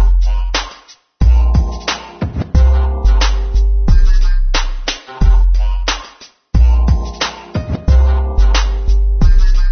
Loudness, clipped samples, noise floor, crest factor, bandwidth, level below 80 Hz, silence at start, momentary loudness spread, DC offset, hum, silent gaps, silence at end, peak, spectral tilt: -15 LUFS; under 0.1%; -41 dBFS; 10 dB; 6.6 kHz; -12 dBFS; 0 s; 9 LU; under 0.1%; none; none; 0 s; 0 dBFS; -5 dB/octave